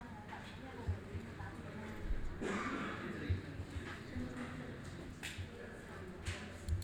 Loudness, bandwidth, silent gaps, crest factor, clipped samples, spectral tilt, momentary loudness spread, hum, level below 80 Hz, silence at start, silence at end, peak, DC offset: -45 LUFS; 19 kHz; none; 18 dB; under 0.1%; -6 dB/octave; 8 LU; none; -52 dBFS; 0 s; 0 s; -26 dBFS; under 0.1%